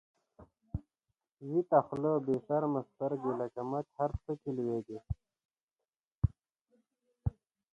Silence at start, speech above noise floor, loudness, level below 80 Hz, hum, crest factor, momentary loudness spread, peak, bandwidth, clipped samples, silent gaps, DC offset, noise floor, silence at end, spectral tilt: 0.4 s; over 56 dB; -35 LUFS; -52 dBFS; none; 24 dB; 15 LU; -12 dBFS; 8.2 kHz; under 0.1%; 5.45-5.49 s, 5.63-5.68 s, 6.07-6.22 s, 6.61-6.65 s; under 0.1%; under -90 dBFS; 0.4 s; -11 dB/octave